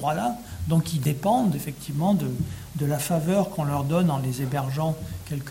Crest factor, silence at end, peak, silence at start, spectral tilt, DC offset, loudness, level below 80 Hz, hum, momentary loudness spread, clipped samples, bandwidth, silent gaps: 14 dB; 0 s; -10 dBFS; 0 s; -6.5 dB/octave; under 0.1%; -26 LUFS; -48 dBFS; none; 8 LU; under 0.1%; 17 kHz; none